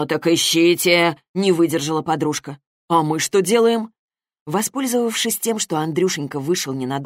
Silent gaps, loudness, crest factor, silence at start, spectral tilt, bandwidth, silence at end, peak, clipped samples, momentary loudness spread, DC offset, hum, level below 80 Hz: 1.29-1.34 s, 2.67-2.88 s, 3.99-4.08 s, 4.41-4.46 s; -19 LUFS; 16 dB; 0 s; -4 dB/octave; 16 kHz; 0 s; -2 dBFS; under 0.1%; 9 LU; under 0.1%; none; -66 dBFS